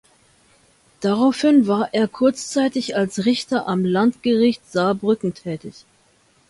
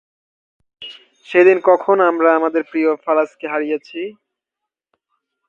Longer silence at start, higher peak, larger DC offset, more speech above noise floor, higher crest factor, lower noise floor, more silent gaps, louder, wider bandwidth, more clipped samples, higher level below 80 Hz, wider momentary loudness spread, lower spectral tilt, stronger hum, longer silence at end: first, 1 s vs 0.8 s; second, -4 dBFS vs 0 dBFS; neither; second, 39 dB vs 68 dB; about the same, 16 dB vs 18 dB; second, -58 dBFS vs -83 dBFS; neither; second, -19 LUFS vs -16 LUFS; first, 11.5 kHz vs 7 kHz; neither; first, -62 dBFS vs -72 dBFS; second, 10 LU vs 21 LU; about the same, -5.5 dB/octave vs -6 dB/octave; neither; second, 0.8 s vs 1.4 s